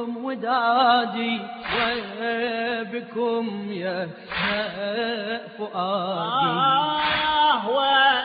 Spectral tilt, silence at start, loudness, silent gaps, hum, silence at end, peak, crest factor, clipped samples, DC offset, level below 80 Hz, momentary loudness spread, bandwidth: -1 dB/octave; 0 s; -23 LUFS; none; none; 0 s; -6 dBFS; 16 dB; under 0.1%; under 0.1%; -58 dBFS; 11 LU; 5 kHz